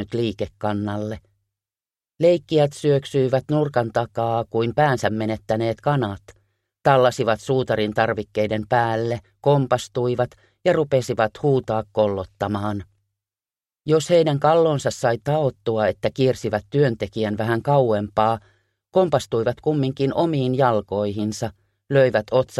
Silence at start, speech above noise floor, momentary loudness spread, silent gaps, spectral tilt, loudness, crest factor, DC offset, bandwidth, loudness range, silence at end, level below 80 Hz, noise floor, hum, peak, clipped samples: 0 s; over 70 dB; 8 LU; none; -6.5 dB/octave; -21 LUFS; 20 dB; under 0.1%; 13 kHz; 2 LU; 0 s; -54 dBFS; under -90 dBFS; none; -2 dBFS; under 0.1%